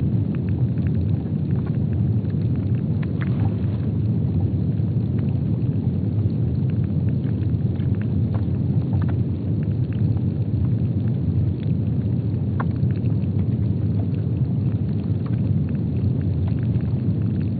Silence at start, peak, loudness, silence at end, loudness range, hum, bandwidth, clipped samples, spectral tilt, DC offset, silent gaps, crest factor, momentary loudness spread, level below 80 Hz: 0 s; -10 dBFS; -22 LUFS; 0 s; 0 LU; none; 4.6 kHz; under 0.1%; -11 dB/octave; under 0.1%; none; 12 dB; 2 LU; -38 dBFS